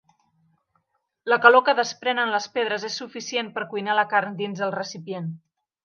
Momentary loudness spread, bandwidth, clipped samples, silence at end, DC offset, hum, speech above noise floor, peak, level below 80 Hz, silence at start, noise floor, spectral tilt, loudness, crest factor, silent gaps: 17 LU; 7.2 kHz; under 0.1%; 0.5 s; under 0.1%; none; 51 dB; 0 dBFS; -80 dBFS; 1.25 s; -74 dBFS; -3.5 dB/octave; -23 LUFS; 24 dB; none